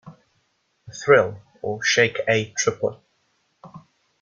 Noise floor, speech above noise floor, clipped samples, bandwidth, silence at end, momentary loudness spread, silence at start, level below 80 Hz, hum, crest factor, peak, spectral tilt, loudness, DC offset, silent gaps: -69 dBFS; 48 dB; under 0.1%; 7.4 kHz; 0.4 s; 13 LU; 0.05 s; -64 dBFS; none; 20 dB; -4 dBFS; -3 dB/octave; -21 LUFS; under 0.1%; none